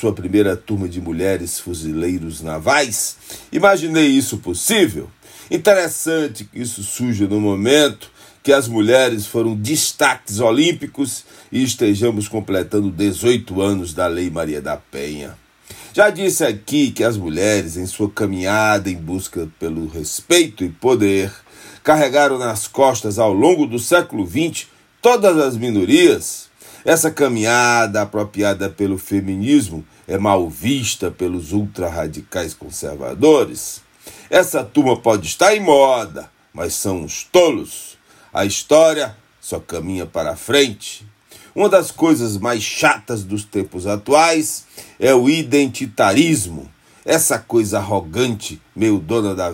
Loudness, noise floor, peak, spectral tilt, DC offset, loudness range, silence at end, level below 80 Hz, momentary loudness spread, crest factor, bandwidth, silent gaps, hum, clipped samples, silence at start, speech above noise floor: -17 LUFS; -40 dBFS; 0 dBFS; -4 dB/octave; under 0.1%; 4 LU; 0 s; -50 dBFS; 13 LU; 18 dB; 16.5 kHz; none; none; under 0.1%; 0 s; 24 dB